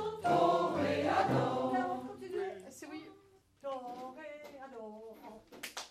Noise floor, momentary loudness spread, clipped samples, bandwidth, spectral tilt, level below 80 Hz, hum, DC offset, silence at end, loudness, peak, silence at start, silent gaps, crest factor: -64 dBFS; 19 LU; under 0.1%; 15.5 kHz; -5.5 dB/octave; -72 dBFS; none; under 0.1%; 0 s; -34 LUFS; -18 dBFS; 0 s; none; 18 dB